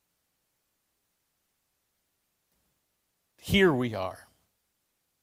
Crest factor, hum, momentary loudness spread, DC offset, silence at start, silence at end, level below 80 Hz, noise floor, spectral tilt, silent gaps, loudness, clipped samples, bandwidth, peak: 24 dB; none; 16 LU; under 0.1%; 3.45 s; 1.1 s; -56 dBFS; -78 dBFS; -5.5 dB/octave; none; -26 LUFS; under 0.1%; 16 kHz; -10 dBFS